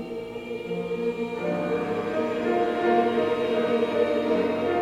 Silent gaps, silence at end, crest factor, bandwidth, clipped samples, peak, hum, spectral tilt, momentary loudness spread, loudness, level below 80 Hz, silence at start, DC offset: none; 0 s; 16 dB; 11 kHz; under 0.1%; -10 dBFS; none; -6.5 dB/octave; 9 LU; -26 LUFS; -60 dBFS; 0 s; under 0.1%